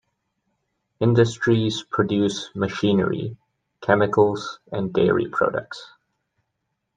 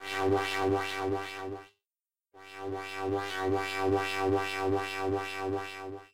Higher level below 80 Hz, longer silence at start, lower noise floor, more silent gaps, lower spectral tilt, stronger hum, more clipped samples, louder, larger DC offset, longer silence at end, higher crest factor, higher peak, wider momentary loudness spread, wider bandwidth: first, -58 dBFS vs -64 dBFS; first, 1 s vs 0 s; second, -77 dBFS vs under -90 dBFS; neither; first, -6.5 dB/octave vs -5 dB/octave; neither; neither; first, -22 LUFS vs -32 LUFS; second, under 0.1% vs 0.2%; first, 1.1 s vs 0 s; about the same, 20 dB vs 16 dB; first, -2 dBFS vs -16 dBFS; about the same, 12 LU vs 11 LU; second, 9.4 kHz vs 16 kHz